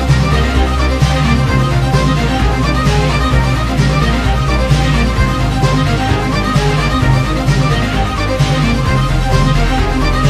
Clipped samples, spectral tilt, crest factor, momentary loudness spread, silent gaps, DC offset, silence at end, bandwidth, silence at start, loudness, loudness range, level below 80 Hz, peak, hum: under 0.1%; -6 dB/octave; 12 dB; 2 LU; none; under 0.1%; 0 s; 14 kHz; 0 s; -13 LUFS; 1 LU; -16 dBFS; 0 dBFS; none